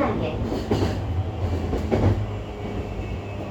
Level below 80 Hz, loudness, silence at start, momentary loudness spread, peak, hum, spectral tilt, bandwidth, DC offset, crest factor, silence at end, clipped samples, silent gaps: -34 dBFS; -26 LUFS; 0 s; 9 LU; -6 dBFS; none; -8 dB/octave; 8.6 kHz; under 0.1%; 18 dB; 0 s; under 0.1%; none